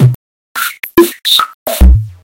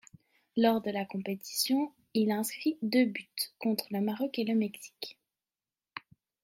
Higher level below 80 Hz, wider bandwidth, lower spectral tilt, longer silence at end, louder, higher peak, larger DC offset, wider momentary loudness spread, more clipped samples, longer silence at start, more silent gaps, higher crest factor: first, -14 dBFS vs -80 dBFS; about the same, 17 kHz vs 16.5 kHz; about the same, -5 dB/octave vs -4.5 dB/octave; second, 0.1 s vs 0.45 s; first, -11 LUFS vs -31 LUFS; first, 0 dBFS vs -14 dBFS; neither; second, 10 LU vs 16 LU; first, 3% vs under 0.1%; second, 0 s vs 0.55 s; first, 0.15-0.55 s, 1.54-1.66 s vs none; second, 10 dB vs 18 dB